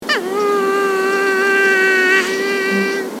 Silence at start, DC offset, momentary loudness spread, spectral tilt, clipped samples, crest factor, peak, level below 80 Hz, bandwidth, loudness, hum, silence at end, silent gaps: 0 s; under 0.1%; 6 LU; -3 dB/octave; under 0.1%; 16 dB; 0 dBFS; -68 dBFS; 16.5 kHz; -15 LUFS; none; 0 s; none